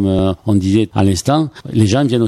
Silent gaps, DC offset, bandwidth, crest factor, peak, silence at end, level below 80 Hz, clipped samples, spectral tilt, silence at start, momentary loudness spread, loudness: none; under 0.1%; 13.5 kHz; 14 dB; 0 dBFS; 0 s; -38 dBFS; under 0.1%; -6.5 dB/octave; 0 s; 3 LU; -15 LUFS